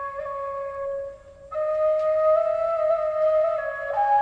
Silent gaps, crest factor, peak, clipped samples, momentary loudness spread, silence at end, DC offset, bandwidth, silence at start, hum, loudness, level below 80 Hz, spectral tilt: none; 12 dB; -12 dBFS; under 0.1%; 10 LU; 0 s; under 0.1%; 5.4 kHz; 0 s; none; -24 LUFS; -58 dBFS; -4.5 dB/octave